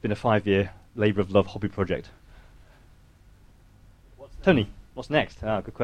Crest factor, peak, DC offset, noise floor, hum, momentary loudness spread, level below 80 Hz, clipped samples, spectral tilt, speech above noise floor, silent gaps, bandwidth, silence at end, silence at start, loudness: 22 dB; -6 dBFS; under 0.1%; -54 dBFS; none; 10 LU; -48 dBFS; under 0.1%; -7.5 dB/octave; 29 dB; none; 9.8 kHz; 0 s; 0.05 s; -26 LUFS